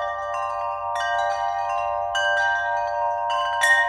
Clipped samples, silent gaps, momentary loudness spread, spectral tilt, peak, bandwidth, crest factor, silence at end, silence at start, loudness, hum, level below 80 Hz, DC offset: under 0.1%; none; 6 LU; 0 dB/octave; -8 dBFS; 19 kHz; 16 dB; 0 s; 0 s; -23 LUFS; none; -56 dBFS; under 0.1%